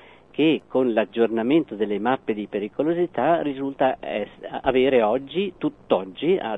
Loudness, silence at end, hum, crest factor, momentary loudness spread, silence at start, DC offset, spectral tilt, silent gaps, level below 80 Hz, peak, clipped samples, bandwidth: -23 LUFS; 0 s; none; 18 dB; 9 LU; 0.35 s; under 0.1%; -8 dB/octave; none; -56 dBFS; -6 dBFS; under 0.1%; 4 kHz